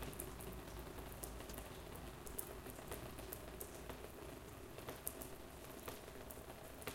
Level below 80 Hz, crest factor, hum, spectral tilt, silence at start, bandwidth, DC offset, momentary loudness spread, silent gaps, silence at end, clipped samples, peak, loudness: -58 dBFS; 32 dB; none; -4 dB/octave; 0 s; 17 kHz; under 0.1%; 5 LU; none; 0 s; under 0.1%; -20 dBFS; -51 LUFS